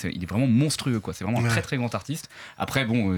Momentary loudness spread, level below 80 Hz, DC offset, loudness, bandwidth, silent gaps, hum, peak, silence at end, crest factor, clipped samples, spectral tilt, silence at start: 12 LU; -52 dBFS; under 0.1%; -26 LUFS; 18.5 kHz; none; none; -8 dBFS; 0 s; 18 dB; under 0.1%; -5.5 dB/octave; 0 s